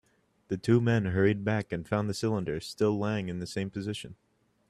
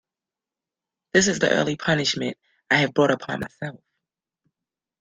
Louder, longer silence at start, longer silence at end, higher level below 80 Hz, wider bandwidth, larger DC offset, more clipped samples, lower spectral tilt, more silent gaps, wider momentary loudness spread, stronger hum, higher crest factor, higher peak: second, -30 LUFS vs -22 LUFS; second, 0.5 s vs 1.15 s; second, 0.55 s vs 1.3 s; about the same, -60 dBFS vs -60 dBFS; first, 13 kHz vs 10 kHz; neither; neither; first, -7 dB/octave vs -4 dB/octave; neither; about the same, 11 LU vs 13 LU; neither; about the same, 20 dB vs 22 dB; second, -10 dBFS vs -2 dBFS